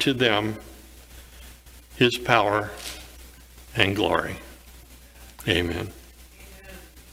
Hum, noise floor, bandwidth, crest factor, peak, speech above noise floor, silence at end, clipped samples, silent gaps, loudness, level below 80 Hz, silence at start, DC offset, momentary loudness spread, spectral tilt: 60 Hz at -50 dBFS; -47 dBFS; 16.5 kHz; 26 dB; 0 dBFS; 24 dB; 0.1 s; under 0.1%; none; -24 LUFS; -48 dBFS; 0 s; under 0.1%; 26 LU; -4.5 dB/octave